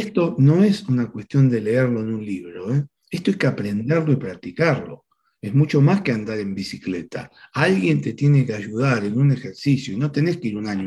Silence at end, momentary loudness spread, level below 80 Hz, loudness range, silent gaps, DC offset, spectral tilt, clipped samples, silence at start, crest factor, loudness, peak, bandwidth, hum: 0 s; 12 LU; -60 dBFS; 3 LU; none; under 0.1%; -8 dB/octave; under 0.1%; 0 s; 18 dB; -21 LUFS; -2 dBFS; 10.5 kHz; none